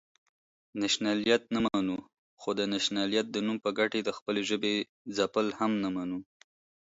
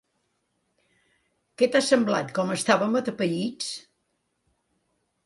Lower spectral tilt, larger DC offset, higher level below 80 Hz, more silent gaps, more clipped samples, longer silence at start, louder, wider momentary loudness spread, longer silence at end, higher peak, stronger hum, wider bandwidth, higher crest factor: about the same, -4 dB/octave vs -4 dB/octave; neither; about the same, -68 dBFS vs -72 dBFS; first, 2.19-2.37 s, 4.22-4.26 s, 4.89-5.05 s vs none; neither; second, 0.75 s vs 1.6 s; second, -30 LUFS vs -24 LUFS; about the same, 9 LU vs 11 LU; second, 0.7 s vs 1.45 s; second, -12 dBFS vs -8 dBFS; neither; second, 8 kHz vs 11.5 kHz; about the same, 20 dB vs 20 dB